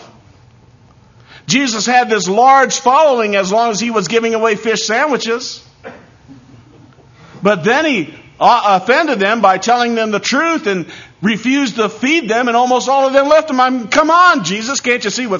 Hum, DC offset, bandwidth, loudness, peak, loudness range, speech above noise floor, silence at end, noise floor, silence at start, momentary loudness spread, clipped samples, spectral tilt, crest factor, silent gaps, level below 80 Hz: none; under 0.1%; 7.4 kHz; -13 LUFS; 0 dBFS; 6 LU; 33 dB; 0 s; -45 dBFS; 0 s; 8 LU; under 0.1%; -3.5 dB/octave; 14 dB; none; -56 dBFS